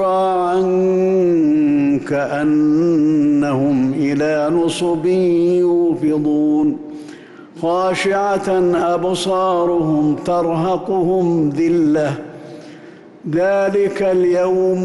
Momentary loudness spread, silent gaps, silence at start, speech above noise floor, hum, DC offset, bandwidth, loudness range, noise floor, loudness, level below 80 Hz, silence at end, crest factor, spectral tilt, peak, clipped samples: 6 LU; none; 0 s; 24 dB; none; under 0.1%; 11.5 kHz; 3 LU; -39 dBFS; -16 LUFS; -54 dBFS; 0 s; 8 dB; -7 dB/octave; -8 dBFS; under 0.1%